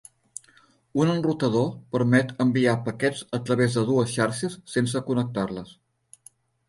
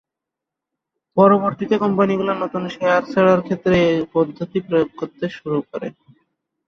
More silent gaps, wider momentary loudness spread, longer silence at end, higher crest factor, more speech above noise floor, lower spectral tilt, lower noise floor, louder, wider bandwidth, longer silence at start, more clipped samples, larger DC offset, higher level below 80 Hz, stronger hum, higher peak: neither; about the same, 10 LU vs 12 LU; first, 0.95 s vs 0.75 s; about the same, 18 dB vs 18 dB; second, 36 dB vs 66 dB; second, -6 dB/octave vs -7.5 dB/octave; second, -59 dBFS vs -84 dBFS; second, -24 LUFS vs -19 LUFS; first, 11.5 kHz vs 6.8 kHz; second, 0.95 s vs 1.15 s; neither; neither; second, -62 dBFS vs -52 dBFS; neither; second, -8 dBFS vs -2 dBFS